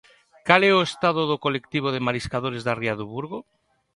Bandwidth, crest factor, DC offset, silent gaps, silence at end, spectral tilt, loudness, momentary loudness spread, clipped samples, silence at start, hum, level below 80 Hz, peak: 11.5 kHz; 24 dB; under 0.1%; none; 0.55 s; -5.5 dB/octave; -23 LUFS; 15 LU; under 0.1%; 0.45 s; none; -56 dBFS; 0 dBFS